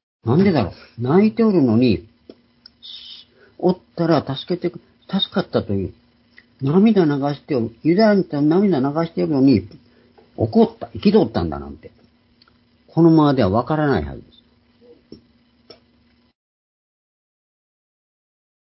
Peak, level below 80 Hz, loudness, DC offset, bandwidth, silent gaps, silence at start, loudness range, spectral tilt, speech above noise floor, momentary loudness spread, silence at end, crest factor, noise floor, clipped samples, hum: -2 dBFS; -46 dBFS; -18 LUFS; under 0.1%; 5.8 kHz; none; 0.25 s; 5 LU; -11.5 dB/octave; 41 dB; 13 LU; 4.5 s; 18 dB; -58 dBFS; under 0.1%; none